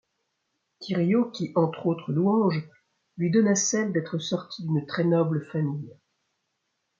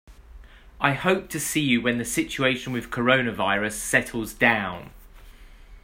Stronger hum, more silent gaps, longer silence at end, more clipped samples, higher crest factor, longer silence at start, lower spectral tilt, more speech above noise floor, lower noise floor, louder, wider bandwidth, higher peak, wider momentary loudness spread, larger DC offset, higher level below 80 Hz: neither; neither; first, 1.1 s vs 0.05 s; neither; about the same, 18 dB vs 22 dB; first, 0.8 s vs 0.1 s; first, -5.5 dB/octave vs -4 dB/octave; first, 53 dB vs 22 dB; first, -78 dBFS vs -46 dBFS; second, -26 LUFS vs -23 LUFS; second, 7.6 kHz vs 16 kHz; second, -8 dBFS vs -2 dBFS; about the same, 9 LU vs 7 LU; neither; second, -72 dBFS vs -48 dBFS